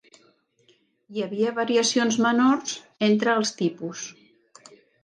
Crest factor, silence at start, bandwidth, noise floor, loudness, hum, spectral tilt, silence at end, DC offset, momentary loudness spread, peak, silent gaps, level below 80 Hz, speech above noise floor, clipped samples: 16 dB; 1.1 s; 10.5 kHz; -63 dBFS; -23 LUFS; none; -3.5 dB/octave; 0.95 s; under 0.1%; 14 LU; -10 dBFS; none; -76 dBFS; 40 dB; under 0.1%